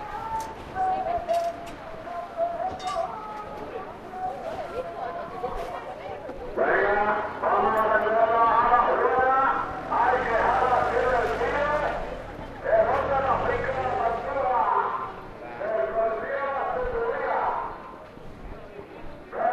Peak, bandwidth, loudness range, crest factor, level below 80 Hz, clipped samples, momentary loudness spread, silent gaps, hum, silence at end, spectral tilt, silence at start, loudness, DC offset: -8 dBFS; 13.5 kHz; 10 LU; 18 dB; -46 dBFS; under 0.1%; 16 LU; none; none; 0 s; -5.5 dB/octave; 0 s; -25 LUFS; under 0.1%